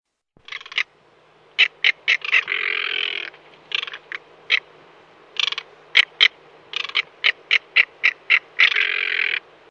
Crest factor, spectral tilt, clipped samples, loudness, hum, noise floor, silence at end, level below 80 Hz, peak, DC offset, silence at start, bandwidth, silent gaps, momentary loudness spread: 22 dB; 1.5 dB/octave; under 0.1%; -19 LUFS; none; -55 dBFS; 0.3 s; -76 dBFS; 0 dBFS; under 0.1%; 0.55 s; 10.5 kHz; none; 14 LU